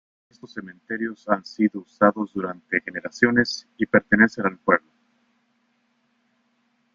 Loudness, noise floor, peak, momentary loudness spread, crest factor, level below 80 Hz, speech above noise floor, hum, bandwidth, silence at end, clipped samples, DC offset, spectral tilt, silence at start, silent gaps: -22 LUFS; -68 dBFS; -2 dBFS; 14 LU; 22 dB; -60 dBFS; 46 dB; none; 7.4 kHz; 2.15 s; under 0.1%; under 0.1%; -6 dB/octave; 0.45 s; none